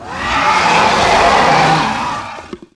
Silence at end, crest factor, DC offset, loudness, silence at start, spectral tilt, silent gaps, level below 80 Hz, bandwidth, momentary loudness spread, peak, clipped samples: 0.2 s; 12 dB; under 0.1%; -11 LUFS; 0 s; -3.5 dB/octave; none; -36 dBFS; 11 kHz; 13 LU; 0 dBFS; under 0.1%